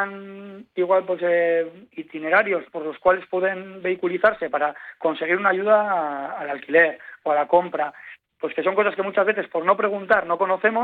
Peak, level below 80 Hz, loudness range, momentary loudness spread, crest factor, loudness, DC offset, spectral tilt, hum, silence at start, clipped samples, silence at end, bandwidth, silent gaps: -4 dBFS; -66 dBFS; 2 LU; 12 LU; 18 dB; -22 LUFS; under 0.1%; -8 dB/octave; none; 0 s; under 0.1%; 0 s; 4.6 kHz; none